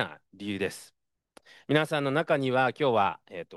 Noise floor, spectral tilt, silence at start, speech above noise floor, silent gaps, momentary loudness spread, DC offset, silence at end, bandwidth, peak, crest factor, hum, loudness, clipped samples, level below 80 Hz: -61 dBFS; -5.5 dB/octave; 0 s; 33 dB; none; 15 LU; under 0.1%; 0 s; 12.5 kHz; -10 dBFS; 20 dB; none; -27 LUFS; under 0.1%; -74 dBFS